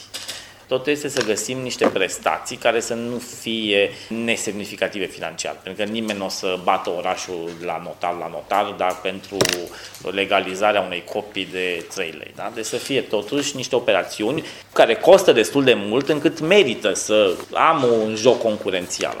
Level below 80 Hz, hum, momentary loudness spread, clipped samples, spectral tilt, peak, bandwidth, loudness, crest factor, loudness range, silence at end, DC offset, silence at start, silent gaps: -60 dBFS; none; 12 LU; under 0.1%; -3.5 dB/octave; 0 dBFS; 17.5 kHz; -21 LUFS; 20 dB; 8 LU; 0 s; under 0.1%; 0 s; none